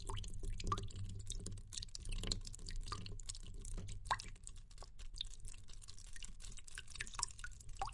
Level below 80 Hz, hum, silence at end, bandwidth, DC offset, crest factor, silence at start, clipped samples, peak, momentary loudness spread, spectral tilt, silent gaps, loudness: -48 dBFS; none; 0 s; 11.5 kHz; under 0.1%; 30 dB; 0 s; under 0.1%; -16 dBFS; 13 LU; -2.5 dB/octave; none; -48 LUFS